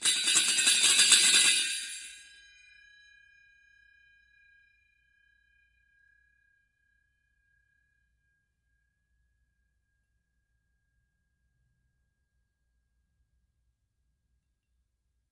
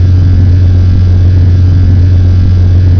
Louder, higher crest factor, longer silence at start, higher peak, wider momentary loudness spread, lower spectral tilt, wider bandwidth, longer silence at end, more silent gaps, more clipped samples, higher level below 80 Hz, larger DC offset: second, -21 LUFS vs -7 LUFS; first, 28 dB vs 4 dB; about the same, 0 s vs 0 s; second, -6 dBFS vs -2 dBFS; first, 20 LU vs 1 LU; second, 3 dB/octave vs -9.5 dB/octave; first, 11.5 kHz vs 5.4 kHz; first, 13.15 s vs 0 s; neither; neither; second, -78 dBFS vs -14 dBFS; second, under 0.1% vs 2%